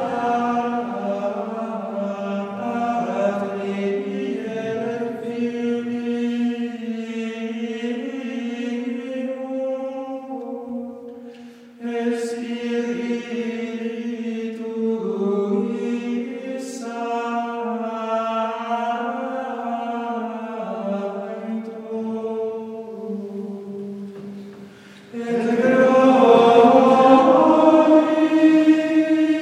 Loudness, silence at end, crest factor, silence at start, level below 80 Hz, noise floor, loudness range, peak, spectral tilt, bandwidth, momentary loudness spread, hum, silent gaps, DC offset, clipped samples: -21 LUFS; 0 s; 20 dB; 0 s; -72 dBFS; -43 dBFS; 14 LU; 0 dBFS; -6.5 dB/octave; 10.5 kHz; 17 LU; none; none; under 0.1%; under 0.1%